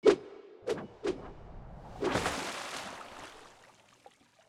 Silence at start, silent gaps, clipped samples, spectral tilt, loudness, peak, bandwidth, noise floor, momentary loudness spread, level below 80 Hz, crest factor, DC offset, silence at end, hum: 0.05 s; none; under 0.1%; -4 dB/octave; -36 LUFS; -12 dBFS; 15 kHz; -61 dBFS; 19 LU; -56 dBFS; 24 dB; under 0.1%; 0.8 s; none